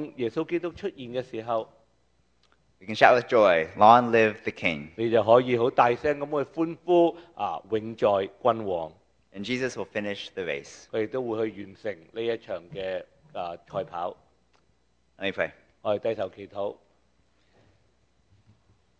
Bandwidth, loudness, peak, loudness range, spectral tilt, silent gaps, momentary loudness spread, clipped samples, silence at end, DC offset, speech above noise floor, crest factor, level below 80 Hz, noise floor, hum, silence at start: 9 kHz; -26 LUFS; 0 dBFS; 13 LU; -6 dB/octave; none; 16 LU; under 0.1%; 2.25 s; under 0.1%; 43 dB; 26 dB; -64 dBFS; -69 dBFS; none; 0 s